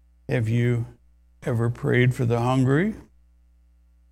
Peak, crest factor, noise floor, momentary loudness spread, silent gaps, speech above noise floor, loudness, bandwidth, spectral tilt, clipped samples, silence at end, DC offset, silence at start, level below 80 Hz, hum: -6 dBFS; 18 dB; -57 dBFS; 10 LU; none; 35 dB; -23 LUFS; 11.5 kHz; -8 dB/octave; under 0.1%; 1.1 s; under 0.1%; 0.3 s; -50 dBFS; none